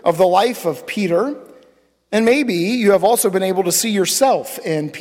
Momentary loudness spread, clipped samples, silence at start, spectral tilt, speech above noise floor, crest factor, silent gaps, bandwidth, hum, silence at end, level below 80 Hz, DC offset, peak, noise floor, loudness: 8 LU; under 0.1%; 0.05 s; -4 dB/octave; 38 dB; 14 dB; none; 17 kHz; none; 0 s; -62 dBFS; under 0.1%; -4 dBFS; -54 dBFS; -16 LUFS